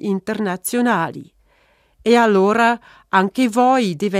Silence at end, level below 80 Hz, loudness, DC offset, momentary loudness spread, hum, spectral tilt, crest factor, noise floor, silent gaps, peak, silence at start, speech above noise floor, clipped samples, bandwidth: 0 s; -60 dBFS; -17 LUFS; under 0.1%; 11 LU; none; -5 dB/octave; 18 dB; -58 dBFS; none; 0 dBFS; 0 s; 41 dB; under 0.1%; 15 kHz